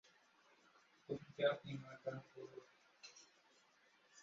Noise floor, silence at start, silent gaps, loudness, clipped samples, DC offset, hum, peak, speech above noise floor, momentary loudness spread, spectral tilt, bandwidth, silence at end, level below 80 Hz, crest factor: -74 dBFS; 1.1 s; none; -46 LUFS; under 0.1%; under 0.1%; none; -24 dBFS; 29 dB; 24 LU; -4 dB/octave; 7.6 kHz; 0 s; -86 dBFS; 26 dB